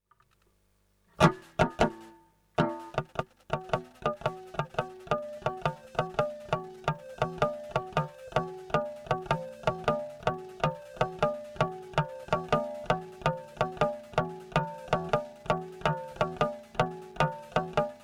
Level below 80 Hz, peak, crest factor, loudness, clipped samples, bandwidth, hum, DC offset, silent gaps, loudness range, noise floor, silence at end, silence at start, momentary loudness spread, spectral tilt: -52 dBFS; -8 dBFS; 24 dB; -32 LUFS; under 0.1%; 15 kHz; 50 Hz at -70 dBFS; under 0.1%; none; 3 LU; -70 dBFS; 0 s; 1.2 s; 6 LU; -6 dB/octave